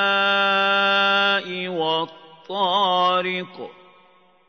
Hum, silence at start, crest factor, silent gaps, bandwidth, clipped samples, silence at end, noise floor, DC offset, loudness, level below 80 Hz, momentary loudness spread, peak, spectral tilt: none; 0 s; 14 dB; none; 6.6 kHz; under 0.1%; 0.8 s; -56 dBFS; under 0.1%; -19 LUFS; -80 dBFS; 15 LU; -6 dBFS; -4.5 dB/octave